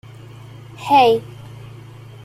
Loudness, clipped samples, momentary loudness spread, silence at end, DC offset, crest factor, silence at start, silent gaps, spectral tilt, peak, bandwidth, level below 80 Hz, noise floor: -15 LUFS; under 0.1%; 26 LU; 0.6 s; under 0.1%; 18 dB; 0.8 s; none; -5.5 dB/octave; -2 dBFS; 14.5 kHz; -56 dBFS; -38 dBFS